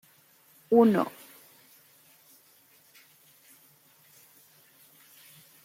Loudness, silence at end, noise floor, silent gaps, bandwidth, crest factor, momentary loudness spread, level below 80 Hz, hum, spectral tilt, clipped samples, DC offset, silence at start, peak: -24 LUFS; 4.55 s; -61 dBFS; none; 16.5 kHz; 22 dB; 31 LU; -78 dBFS; none; -7 dB/octave; under 0.1%; under 0.1%; 0.7 s; -10 dBFS